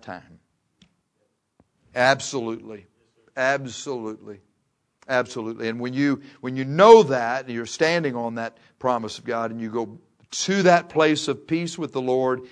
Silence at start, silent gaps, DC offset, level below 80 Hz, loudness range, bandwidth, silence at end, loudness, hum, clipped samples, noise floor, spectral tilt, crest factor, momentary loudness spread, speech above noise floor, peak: 0.05 s; none; under 0.1%; -68 dBFS; 9 LU; 10.5 kHz; 0.05 s; -22 LUFS; none; under 0.1%; -72 dBFS; -4.5 dB/octave; 24 dB; 16 LU; 50 dB; 0 dBFS